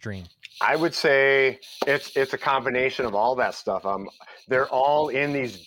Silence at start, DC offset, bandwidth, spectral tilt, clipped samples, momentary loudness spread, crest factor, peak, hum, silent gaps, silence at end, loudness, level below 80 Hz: 0.05 s; under 0.1%; 17 kHz; -4.5 dB/octave; under 0.1%; 11 LU; 16 dB; -8 dBFS; none; none; 0.05 s; -23 LUFS; -62 dBFS